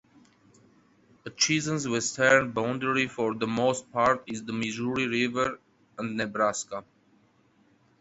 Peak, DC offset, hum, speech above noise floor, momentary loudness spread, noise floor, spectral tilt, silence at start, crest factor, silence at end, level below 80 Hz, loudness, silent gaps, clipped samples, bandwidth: -6 dBFS; under 0.1%; none; 37 dB; 15 LU; -64 dBFS; -3.5 dB/octave; 1.25 s; 24 dB; 1.2 s; -64 dBFS; -27 LUFS; none; under 0.1%; 8.2 kHz